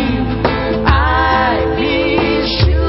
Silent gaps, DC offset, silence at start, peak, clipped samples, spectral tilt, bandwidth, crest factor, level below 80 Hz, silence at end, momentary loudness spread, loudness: none; under 0.1%; 0 s; 0 dBFS; under 0.1%; -10 dB/octave; 5.8 kHz; 14 dB; -20 dBFS; 0 s; 4 LU; -14 LUFS